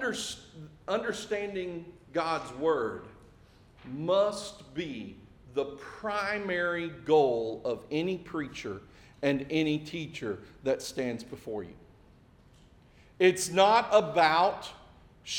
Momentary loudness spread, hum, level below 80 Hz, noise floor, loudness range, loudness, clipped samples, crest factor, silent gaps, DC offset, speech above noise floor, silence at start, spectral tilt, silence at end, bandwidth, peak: 17 LU; none; -62 dBFS; -58 dBFS; 7 LU; -30 LUFS; under 0.1%; 22 dB; none; under 0.1%; 29 dB; 0 s; -4 dB/octave; 0 s; 18 kHz; -8 dBFS